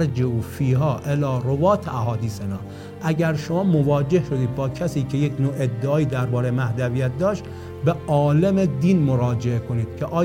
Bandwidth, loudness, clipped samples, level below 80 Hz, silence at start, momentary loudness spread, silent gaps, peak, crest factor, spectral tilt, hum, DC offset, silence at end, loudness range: 16 kHz; -22 LUFS; under 0.1%; -46 dBFS; 0 s; 7 LU; none; -6 dBFS; 14 dB; -8 dB/octave; none; under 0.1%; 0 s; 2 LU